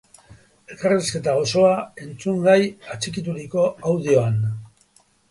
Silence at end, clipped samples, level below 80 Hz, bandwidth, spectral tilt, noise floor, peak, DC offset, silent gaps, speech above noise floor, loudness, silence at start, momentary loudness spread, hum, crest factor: 0.65 s; under 0.1%; -56 dBFS; 11.5 kHz; -5.5 dB/octave; -59 dBFS; -4 dBFS; under 0.1%; none; 39 dB; -21 LUFS; 0.3 s; 12 LU; none; 18 dB